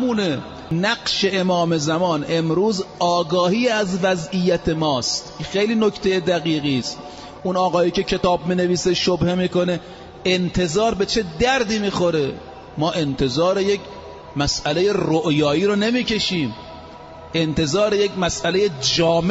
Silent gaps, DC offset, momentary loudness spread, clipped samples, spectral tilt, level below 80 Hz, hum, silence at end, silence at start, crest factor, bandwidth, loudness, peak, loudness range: none; under 0.1%; 8 LU; under 0.1%; -4.5 dB/octave; -44 dBFS; none; 0 s; 0 s; 14 dB; 8 kHz; -20 LUFS; -6 dBFS; 1 LU